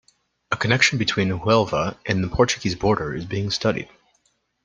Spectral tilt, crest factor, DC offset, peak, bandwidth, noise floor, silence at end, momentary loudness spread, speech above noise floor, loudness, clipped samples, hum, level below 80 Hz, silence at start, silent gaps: -4.5 dB/octave; 22 dB; under 0.1%; 0 dBFS; 10 kHz; -67 dBFS; 0.8 s; 10 LU; 46 dB; -21 LUFS; under 0.1%; none; -46 dBFS; 0.5 s; none